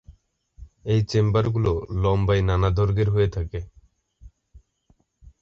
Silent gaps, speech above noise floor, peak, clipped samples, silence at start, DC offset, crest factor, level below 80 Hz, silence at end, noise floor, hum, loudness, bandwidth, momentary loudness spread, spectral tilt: none; 43 dB; -6 dBFS; under 0.1%; 0.1 s; under 0.1%; 18 dB; -36 dBFS; 0.15 s; -64 dBFS; none; -22 LUFS; 7.2 kHz; 12 LU; -8 dB/octave